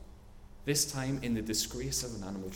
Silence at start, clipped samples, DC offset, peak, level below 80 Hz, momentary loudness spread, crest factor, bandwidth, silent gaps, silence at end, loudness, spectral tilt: 0 s; under 0.1%; under 0.1%; -18 dBFS; -50 dBFS; 9 LU; 18 dB; 18 kHz; none; 0 s; -33 LUFS; -3.5 dB/octave